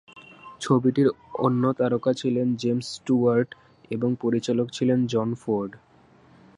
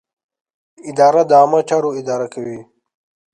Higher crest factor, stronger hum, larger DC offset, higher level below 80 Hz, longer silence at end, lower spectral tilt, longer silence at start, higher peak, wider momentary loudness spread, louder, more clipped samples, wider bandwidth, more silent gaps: about the same, 18 dB vs 16 dB; neither; neither; about the same, -64 dBFS vs -68 dBFS; about the same, 0.8 s vs 0.7 s; first, -7 dB/octave vs -5.5 dB/octave; second, 0.15 s vs 0.85 s; second, -8 dBFS vs 0 dBFS; second, 7 LU vs 18 LU; second, -24 LUFS vs -14 LUFS; neither; about the same, 10.5 kHz vs 10.5 kHz; neither